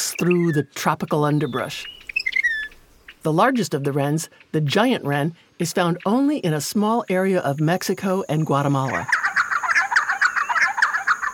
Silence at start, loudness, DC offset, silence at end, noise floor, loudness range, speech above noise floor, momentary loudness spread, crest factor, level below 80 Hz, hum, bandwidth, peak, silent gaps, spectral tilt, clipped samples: 0 s; -21 LUFS; under 0.1%; 0 s; -48 dBFS; 3 LU; 27 dB; 7 LU; 18 dB; -60 dBFS; none; 18 kHz; -4 dBFS; none; -5 dB/octave; under 0.1%